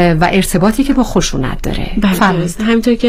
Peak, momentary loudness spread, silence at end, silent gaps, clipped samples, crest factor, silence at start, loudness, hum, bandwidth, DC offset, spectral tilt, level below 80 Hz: 0 dBFS; 7 LU; 0 s; none; under 0.1%; 12 dB; 0 s; -13 LUFS; none; 16 kHz; under 0.1%; -5.5 dB/octave; -24 dBFS